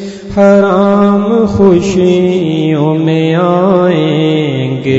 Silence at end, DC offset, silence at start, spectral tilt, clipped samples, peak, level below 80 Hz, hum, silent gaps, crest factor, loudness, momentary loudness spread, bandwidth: 0 s; under 0.1%; 0 s; -7.5 dB/octave; 0.6%; 0 dBFS; -40 dBFS; none; none; 8 dB; -9 LUFS; 4 LU; 8 kHz